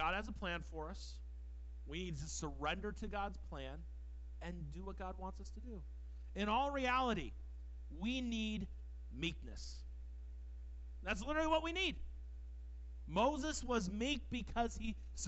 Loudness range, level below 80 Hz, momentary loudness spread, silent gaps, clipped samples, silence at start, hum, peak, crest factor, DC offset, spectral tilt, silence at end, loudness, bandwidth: 6 LU; -50 dBFS; 17 LU; none; under 0.1%; 0 s; none; -22 dBFS; 20 dB; under 0.1%; -4.5 dB/octave; 0 s; -42 LUFS; 8.2 kHz